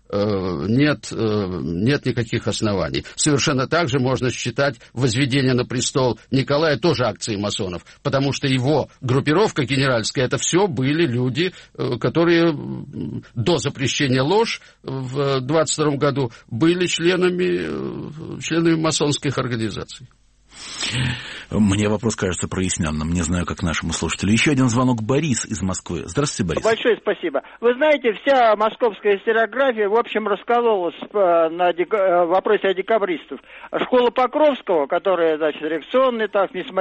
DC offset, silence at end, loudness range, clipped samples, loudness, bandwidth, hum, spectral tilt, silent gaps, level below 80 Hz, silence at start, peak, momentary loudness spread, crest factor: under 0.1%; 0 s; 3 LU; under 0.1%; -20 LUFS; 8.8 kHz; none; -5 dB/octave; none; -46 dBFS; 0.1 s; -6 dBFS; 9 LU; 14 dB